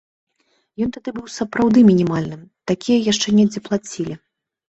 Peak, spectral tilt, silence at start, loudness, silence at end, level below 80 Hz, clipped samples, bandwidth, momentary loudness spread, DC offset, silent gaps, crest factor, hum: -2 dBFS; -5.5 dB/octave; 0.8 s; -18 LUFS; 0.6 s; -54 dBFS; under 0.1%; 8.2 kHz; 17 LU; under 0.1%; none; 16 dB; none